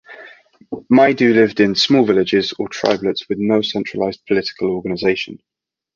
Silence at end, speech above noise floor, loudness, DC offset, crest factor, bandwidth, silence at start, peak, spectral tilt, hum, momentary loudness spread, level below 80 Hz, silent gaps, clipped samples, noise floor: 0.6 s; 25 dB; -16 LUFS; under 0.1%; 16 dB; 7.2 kHz; 0.1 s; 0 dBFS; -5.5 dB/octave; none; 10 LU; -54 dBFS; none; under 0.1%; -41 dBFS